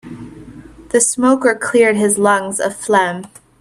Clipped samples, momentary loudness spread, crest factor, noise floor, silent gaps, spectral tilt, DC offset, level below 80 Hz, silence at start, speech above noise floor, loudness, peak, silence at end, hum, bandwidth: under 0.1%; 18 LU; 16 dB; -37 dBFS; none; -3.5 dB/octave; under 0.1%; -52 dBFS; 0.05 s; 23 dB; -14 LUFS; 0 dBFS; 0.35 s; none; 13.5 kHz